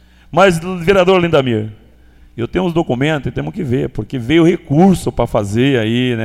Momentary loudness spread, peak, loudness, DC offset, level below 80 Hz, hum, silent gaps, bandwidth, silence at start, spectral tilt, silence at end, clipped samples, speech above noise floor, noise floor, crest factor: 10 LU; 0 dBFS; -14 LUFS; under 0.1%; -36 dBFS; none; none; 15 kHz; 0.3 s; -6.5 dB/octave; 0 s; under 0.1%; 30 dB; -44 dBFS; 14 dB